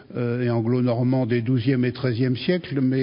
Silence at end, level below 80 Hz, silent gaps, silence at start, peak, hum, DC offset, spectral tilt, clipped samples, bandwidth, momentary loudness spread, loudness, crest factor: 0 s; -58 dBFS; none; 0 s; -8 dBFS; none; under 0.1%; -12.5 dB/octave; under 0.1%; 5.4 kHz; 3 LU; -23 LUFS; 14 dB